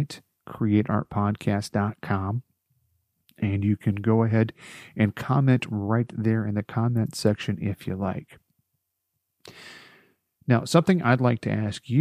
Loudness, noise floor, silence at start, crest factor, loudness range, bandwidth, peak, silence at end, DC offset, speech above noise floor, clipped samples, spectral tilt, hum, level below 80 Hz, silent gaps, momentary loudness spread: -25 LUFS; -79 dBFS; 0 s; 20 dB; 5 LU; 14.5 kHz; -4 dBFS; 0 s; under 0.1%; 55 dB; under 0.1%; -7 dB/octave; none; -62 dBFS; none; 15 LU